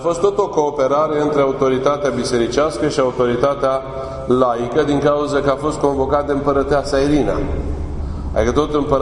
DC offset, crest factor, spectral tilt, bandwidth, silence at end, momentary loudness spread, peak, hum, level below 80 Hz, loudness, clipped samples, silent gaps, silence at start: under 0.1%; 16 dB; -6 dB/octave; 11 kHz; 0 s; 7 LU; 0 dBFS; none; -32 dBFS; -17 LUFS; under 0.1%; none; 0 s